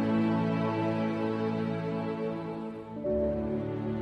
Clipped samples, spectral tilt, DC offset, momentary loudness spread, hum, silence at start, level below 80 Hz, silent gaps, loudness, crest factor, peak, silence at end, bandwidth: under 0.1%; -9 dB/octave; under 0.1%; 8 LU; none; 0 s; -52 dBFS; none; -31 LUFS; 12 dB; -18 dBFS; 0 s; 6.4 kHz